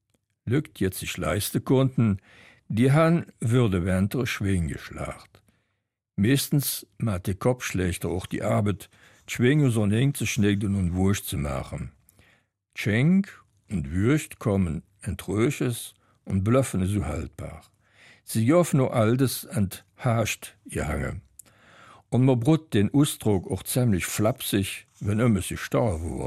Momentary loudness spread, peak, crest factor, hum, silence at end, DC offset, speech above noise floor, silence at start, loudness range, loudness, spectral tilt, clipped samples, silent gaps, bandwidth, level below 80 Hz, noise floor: 13 LU; -8 dBFS; 16 dB; none; 0 s; under 0.1%; 54 dB; 0.45 s; 4 LU; -25 LUFS; -6 dB/octave; under 0.1%; none; 15.5 kHz; -46 dBFS; -79 dBFS